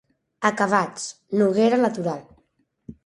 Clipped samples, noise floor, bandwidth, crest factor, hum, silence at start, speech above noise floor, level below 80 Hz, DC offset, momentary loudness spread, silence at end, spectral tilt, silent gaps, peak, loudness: under 0.1%; -67 dBFS; 11.5 kHz; 20 dB; none; 0.4 s; 45 dB; -64 dBFS; under 0.1%; 11 LU; 0.15 s; -5 dB/octave; none; -2 dBFS; -22 LUFS